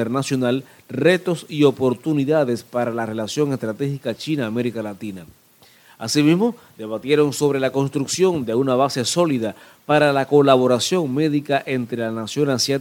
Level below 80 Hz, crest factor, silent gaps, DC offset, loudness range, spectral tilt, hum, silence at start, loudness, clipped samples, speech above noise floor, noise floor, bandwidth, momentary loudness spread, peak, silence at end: -64 dBFS; 20 dB; none; under 0.1%; 5 LU; -5 dB/octave; none; 0 s; -20 LUFS; under 0.1%; 33 dB; -52 dBFS; 17.5 kHz; 11 LU; 0 dBFS; 0 s